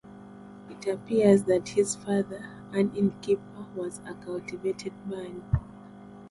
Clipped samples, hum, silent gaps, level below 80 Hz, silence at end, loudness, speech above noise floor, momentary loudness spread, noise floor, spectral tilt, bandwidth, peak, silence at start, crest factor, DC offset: under 0.1%; 50 Hz at -45 dBFS; none; -48 dBFS; 0 s; -28 LUFS; 19 dB; 24 LU; -47 dBFS; -6.5 dB/octave; 11.5 kHz; -8 dBFS; 0.05 s; 20 dB; under 0.1%